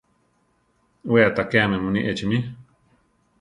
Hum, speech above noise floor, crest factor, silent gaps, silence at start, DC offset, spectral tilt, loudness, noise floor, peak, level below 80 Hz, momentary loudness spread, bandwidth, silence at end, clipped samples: none; 45 dB; 20 dB; none; 1.05 s; under 0.1%; -7 dB/octave; -21 LUFS; -66 dBFS; -4 dBFS; -52 dBFS; 11 LU; 10.5 kHz; 0.8 s; under 0.1%